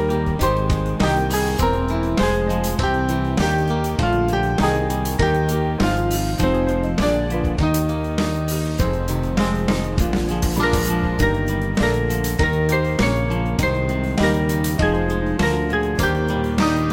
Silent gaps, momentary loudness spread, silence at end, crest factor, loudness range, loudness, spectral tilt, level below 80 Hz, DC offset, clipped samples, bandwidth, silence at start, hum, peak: none; 3 LU; 0 s; 14 dB; 1 LU; -20 LUFS; -6 dB/octave; -26 dBFS; under 0.1%; under 0.1%; 17 kHz; 0 s; none; -4 dBFS